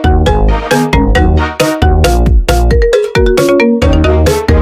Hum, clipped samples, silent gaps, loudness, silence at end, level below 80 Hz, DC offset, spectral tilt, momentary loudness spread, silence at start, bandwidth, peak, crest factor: none; 0.2%; none; -10 LUFS; 0 s; -12 dBFS; under 0.1%; -6 dB/octave; 2 LU; 0 s; 15.5 kHz; 0 dBFS; 8 dB